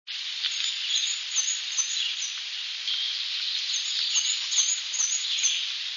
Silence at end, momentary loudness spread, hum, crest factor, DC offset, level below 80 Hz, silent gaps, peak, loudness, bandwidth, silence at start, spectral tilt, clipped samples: 0 s; 6 LU; none; 18 dB; under 0.1%; under -90 dBFS; none; -10 dBFS; -25 LUFS; 7.6 kHz; 0.05 s; 8 dB/octave; under 0.1%